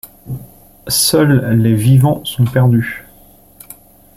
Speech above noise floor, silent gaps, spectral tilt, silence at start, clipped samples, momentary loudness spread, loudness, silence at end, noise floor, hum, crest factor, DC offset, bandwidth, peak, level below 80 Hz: 33 dB; none; -5.5 dB/octave; 0.05 s; under 0.1%; 18 LU; -12 LUFS; 1.15 s; -44 dBFS; none; 14 dB; under 0.1%; 16.5 kHz; 0 dBFS; -44 dBFS